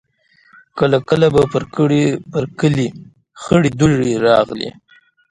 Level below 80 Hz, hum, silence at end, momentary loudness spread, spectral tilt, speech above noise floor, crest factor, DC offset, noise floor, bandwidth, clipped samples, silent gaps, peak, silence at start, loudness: -44 dBFS; none; 0.6 s; 11 LU; -6.5 dB/octave; 39 dB; 16 dB; under 0.1%; -54 dBFS; 11 kHz; under 0.1%; none; 0 dBFS; 0.75 s; -16 LUFS